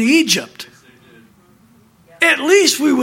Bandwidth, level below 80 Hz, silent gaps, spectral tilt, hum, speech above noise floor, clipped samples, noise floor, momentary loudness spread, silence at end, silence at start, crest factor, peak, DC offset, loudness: 17 kHz; -66 dBFS; none; -2 dB/octave; none; 37 dB; under 0.1%; -50 dBFS; 23 LU; 0 s; 0 s; 16 dB; 0 dBFS; under 0.1%; -13 LUFS